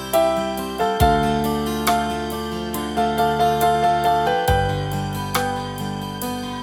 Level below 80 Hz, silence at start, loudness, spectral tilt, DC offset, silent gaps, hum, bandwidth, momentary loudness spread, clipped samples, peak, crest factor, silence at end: -34 dBFS; 0 s; -21 LUFS; -5 dB/octave; under 0.1%; none; none; 19.5 kHz; 9 LU; under 0.1%; -2 dBFS; 18 dB; 0 s